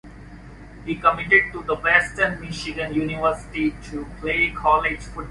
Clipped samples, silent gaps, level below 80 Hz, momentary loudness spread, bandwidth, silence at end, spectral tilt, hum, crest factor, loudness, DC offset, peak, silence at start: under 0.1%; none; -42 dBFS; 14 LU; 11.5 kHz; 0 s; -5 dB/octave; none; 22 dB; -21 LUFS; under 0.1%; -2 dBFS; 0.05 s